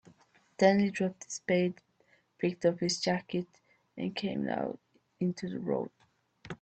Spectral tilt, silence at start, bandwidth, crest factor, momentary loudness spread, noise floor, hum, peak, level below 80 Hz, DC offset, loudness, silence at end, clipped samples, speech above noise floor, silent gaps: -5.5 dB/octave; 0.6 s; 8.8 kHz; 22 dB; 16 LU; -69 dBFS; none; -10 dBFS; -72 dBFS; under 0.1%; -32 LUFS; 0.05 s; under 0.1%; 38 dB; none